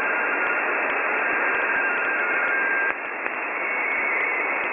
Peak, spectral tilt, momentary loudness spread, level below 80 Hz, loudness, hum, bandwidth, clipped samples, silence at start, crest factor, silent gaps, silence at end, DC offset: -6 dBFS; 0 dB/octave; 4 LU; -70 dBFS; -22 LUFS; none; 3.7 kHz; under 0.1%; 0 s; 18 dB; none; 0 s; under 0.1%